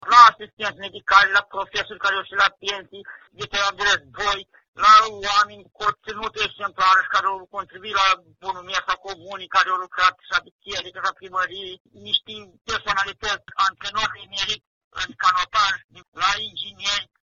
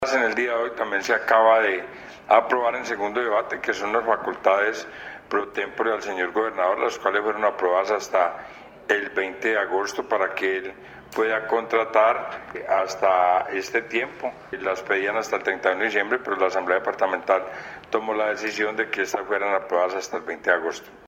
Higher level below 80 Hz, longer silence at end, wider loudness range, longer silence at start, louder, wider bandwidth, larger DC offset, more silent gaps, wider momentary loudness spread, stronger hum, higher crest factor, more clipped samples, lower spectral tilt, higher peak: first, -54 dBFS vs -62 dBFS; first, 0.2 s vs 0 s; first, 6 LU vs 3 LU; about the same, 0.05 s vs 0 s; about the same, -21 LUFS vs -23 LUFS; second, 7.4 kHz vs 16.5 kHz; neither; first, 0.53-0.57 s, 4.68-4.73 s, 10.51-10.59 s, 11.80-11.85 s, 12.61-12.65 s, 14.67-14.91 s, 15.84-15.89 s, 16.08-16.12 s vs none; first, 16 LU vs 10 LU; neither; about the same, 22 dB vs 22 dB; neither; second, 2.5 dB/octave vs -3 dB/octave; about the same, 0 dBFS vs -2 dBFS